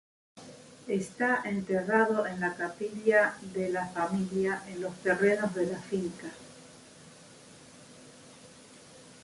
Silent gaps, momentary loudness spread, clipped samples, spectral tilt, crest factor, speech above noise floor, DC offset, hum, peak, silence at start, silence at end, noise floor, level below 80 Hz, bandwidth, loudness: none; 25 LU; under 0.1%; -6 dB/octave; 20 dB; 23 dB; under 0.1%; none; -12 dBFS; 0.35 s; 0.05 s; -53 dBFS; -68 dBFS; 11.5 kHz; -30 LUFS